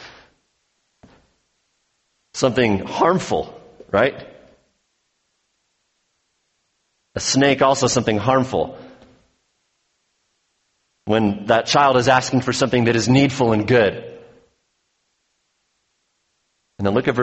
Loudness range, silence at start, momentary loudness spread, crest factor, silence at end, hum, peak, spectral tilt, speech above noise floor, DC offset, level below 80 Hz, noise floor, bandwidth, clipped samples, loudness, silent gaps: 10 LU; 0 s; 15 LU; 20 dB; 0 s; none; -2 dBFS; -5 dB/octave; 53 dB; under 0.1%; -52 dBFS; -70 dBFS; 8.4 kHz; under 0.1%; -18 LUFS; none